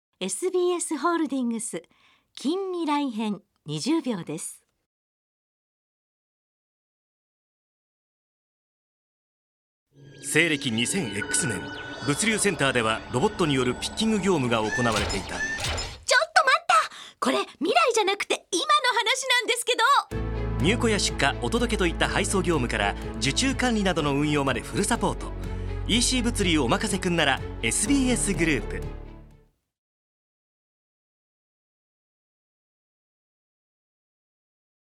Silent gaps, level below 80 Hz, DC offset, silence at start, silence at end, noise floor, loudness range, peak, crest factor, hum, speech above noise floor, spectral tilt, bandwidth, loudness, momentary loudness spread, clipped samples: 4.86-9.86 s; -40 dBFS; under 0.1%; 0.2 s; 5.6 s; -58 dBFS; 8 LU; -4 dBFS; 22 dB; none; 33 dB; -3.5 dB/octave; 17.5 kHz; -24 LUFS; 11 LU; under 0.1%